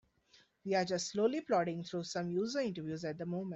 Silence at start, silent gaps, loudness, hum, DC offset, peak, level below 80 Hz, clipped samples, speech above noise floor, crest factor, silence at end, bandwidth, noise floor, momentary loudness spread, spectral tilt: 0.65 s; none; -36 LUFS; none; under 0.1%; -20 dBFS; -76 dBFS; under 0.1%; 33 dB; 16 dB; 0 s; 8.2 kHz; -68 dBFS; 7 LU; -5 dB/octave